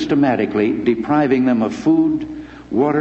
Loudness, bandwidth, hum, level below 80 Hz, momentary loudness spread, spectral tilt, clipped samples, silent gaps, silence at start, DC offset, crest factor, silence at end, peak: -17 LUFS; 7.8 kHz; none; -48 dBFS; 9 LU; -7.5 dB/octave; under 0.1%; none; 0 s; under 0.1%; 14 dB; 0 s; -4 dBFS